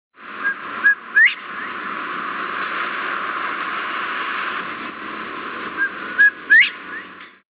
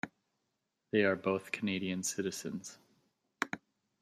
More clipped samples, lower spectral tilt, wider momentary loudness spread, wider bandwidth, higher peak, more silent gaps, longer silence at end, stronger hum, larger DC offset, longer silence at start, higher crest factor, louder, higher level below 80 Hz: neither; second, 1.5 dB/octave vs -4 dB/octave; about the same, 16 LU vs 15 LU; second, 4 kHz vs 15 kHz; first, -4 dBFS vs -12 dBFS; neither; second, 0.25 s vs 0.45 s; neither; neither; first, 0.2 s vs 0.05 s; second, 18 dB vs 24 dB; first, -19 LUFS vs -35 LUFS; first, -68 dBFS vs -80 dBFS